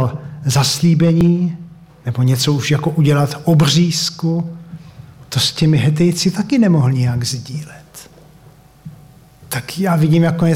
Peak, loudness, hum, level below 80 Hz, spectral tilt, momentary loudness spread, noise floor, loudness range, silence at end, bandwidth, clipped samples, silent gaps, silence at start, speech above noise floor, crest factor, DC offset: -4 dBFS; -15 LUFS; none; -46 dBFS; -5.5 dB/octave; 16 LU; -44 dBFS; 5 LU; 0 s; 16.5 kHz; under 0.1%; none; 0 s; 30 dB; 12 dB; under 0.1%